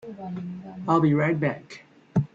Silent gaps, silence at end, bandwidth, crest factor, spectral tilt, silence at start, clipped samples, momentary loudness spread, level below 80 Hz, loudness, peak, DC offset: none; 0.1 s; 7.6 kHz; 20 dB; -9 dB/octave; 0.05 s; under 0.1%; 18 LU; -60 dBFS; -25 LUFS; -6 dBFS; under 0.1%